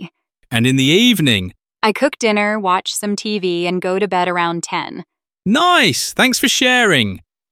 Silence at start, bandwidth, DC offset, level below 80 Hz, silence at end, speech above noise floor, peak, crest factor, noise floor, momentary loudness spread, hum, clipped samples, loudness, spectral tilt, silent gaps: 0 s; 17 kHz; under 0.1%; -56 dBFS; 0.35 s; 22 dB; 0 dBFS; 16 dB; -37 dBFS; 11 LU; none; under 0.1%; -15 LUFS; -3.5 dB/octave; none